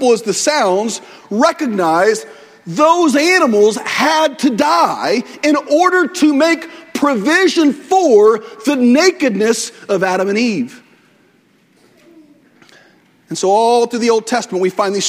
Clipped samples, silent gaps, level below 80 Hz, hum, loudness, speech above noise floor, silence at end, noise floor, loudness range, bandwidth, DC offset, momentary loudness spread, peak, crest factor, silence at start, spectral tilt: under 0.1%; none; -64 dBFS; none; -13 LUFS; 40 dB; 0 s; -53 dBFS; 7 LU; 16 kHz; under 0.1%; 8 LU; 0 dBFS; 14 dB; 0 s; -3.5 dB/octave